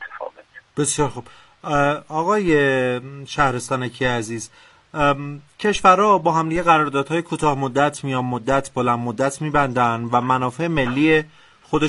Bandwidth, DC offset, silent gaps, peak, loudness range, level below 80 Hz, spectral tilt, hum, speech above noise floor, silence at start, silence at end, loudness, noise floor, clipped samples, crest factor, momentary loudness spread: 11.5 kHz; under 0.1%; none; -2 dBFS; 3 LU; -44 dBFS; -5 dB/octave; none; 20 dB; 0 s; 0 s; -19 LUFS; -40 dBFS; under 0.1%; 18 dB; 14 LU